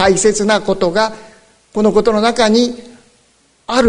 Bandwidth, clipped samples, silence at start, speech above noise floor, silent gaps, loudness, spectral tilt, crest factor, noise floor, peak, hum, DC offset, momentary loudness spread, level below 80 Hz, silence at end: 11 kHz; under 0.1%; 0 s; 41 dB; none; -14 LUFS; -4 dB/octave; 14 dB; -54 dBFS; 0 dBFS; none; under 0.1%; 10 LU; -42 dBFS; 0 s